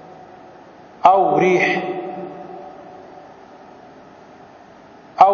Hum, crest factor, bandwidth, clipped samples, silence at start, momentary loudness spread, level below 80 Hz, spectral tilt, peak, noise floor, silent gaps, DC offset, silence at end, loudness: none; 20 dB; 7 kHz; under 0.1%; 1.05 s; 27 LU; -64 dBFS; -6 dB/octave; 0 dBFS; -44 dBFS; none; under 0.1%; 0 s; -17 LUFS